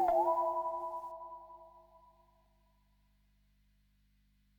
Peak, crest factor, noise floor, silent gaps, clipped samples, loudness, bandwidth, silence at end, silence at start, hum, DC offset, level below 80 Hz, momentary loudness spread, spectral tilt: -20 dBFS; 18 dB; -71 dBFS; none; under 0.1%; -35 LUFS; 19 kHz; 2.8 s; 0 s; 50 Hz at -70 dBFS; under 0.1%; -68 dBFS; 23 LU; -6.5 dB/octave